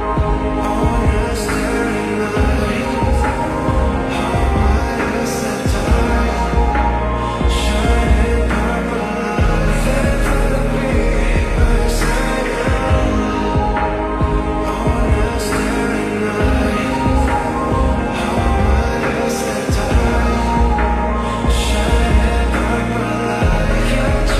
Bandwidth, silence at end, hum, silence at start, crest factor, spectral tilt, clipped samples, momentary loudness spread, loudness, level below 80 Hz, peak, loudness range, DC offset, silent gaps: 14 kHz; 0 s; none; 0 s; 12 dB; -6 dB/octave; under 0.1%; 3 LU; -17 LUFS; -18 dBFS; -2 dBFS; 1 LU; under 0.1%; none